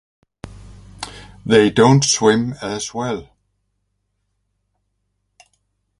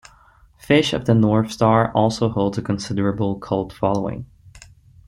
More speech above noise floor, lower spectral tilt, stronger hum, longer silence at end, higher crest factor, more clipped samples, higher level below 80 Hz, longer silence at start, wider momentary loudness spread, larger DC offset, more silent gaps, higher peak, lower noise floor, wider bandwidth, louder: first, 56 dB vs 33 dB; second, -4.5 dB/octave vs -6.5 dB/octave; neither; first, 2.75 s vs 0.5 s; about the same, 20 dB vs 18 dB; neither; about the same, -48 dBFS vs -48 dBFS; second, 0.45 s vs 0.7 s; first, 21 LU vs 8 LU; neither; neither; about the same, 0 dBFS vs -2 dBFS; first, -71 dBFS vs -52 dBFS; about the same, 11.5 kHz vs 12.5 kHz; first, -16 LUFS vs -20 LUFS